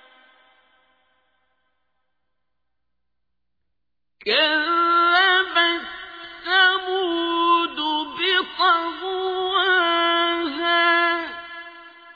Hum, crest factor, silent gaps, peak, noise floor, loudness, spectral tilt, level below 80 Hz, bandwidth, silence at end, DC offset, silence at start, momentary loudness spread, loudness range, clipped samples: 60 Hz at -80 dBFS; 18 dB; none; -4 dBFS; -83 dBFS; -19 LUFS; -3.5 dB/octave; -64 dBFS; 5 kHz; 0.05 s; under 0.1%; 4.25 s; 16 LU; 4 LU; under 0.1%